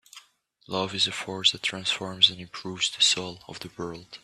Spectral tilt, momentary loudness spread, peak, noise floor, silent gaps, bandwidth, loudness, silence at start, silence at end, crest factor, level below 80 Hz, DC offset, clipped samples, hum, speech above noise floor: -1.5 dB/octave; 17 LU; -4 dBFS; -60 dBFS; none; 14 kHz; -24 LUFS; 0.15 s; 0.05 s; 24 dB; -66 dBFS; under 0.1%; under 0.1%; none; 33 dB